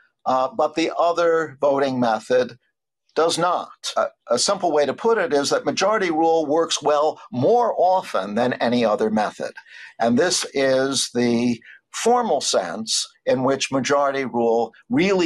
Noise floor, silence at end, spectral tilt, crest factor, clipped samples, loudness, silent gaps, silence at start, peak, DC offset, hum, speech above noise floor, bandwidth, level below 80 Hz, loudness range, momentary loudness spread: -70 dBFS; 0 s; -3.5 dB/octave; 12 dB; under 0.1%; -20 LUFS; none; 0.25 s; -10 dBFS; under 0.1%; none; 49 dB; 12.5 kHz; -66 dBFS; 2 LU; 6 LU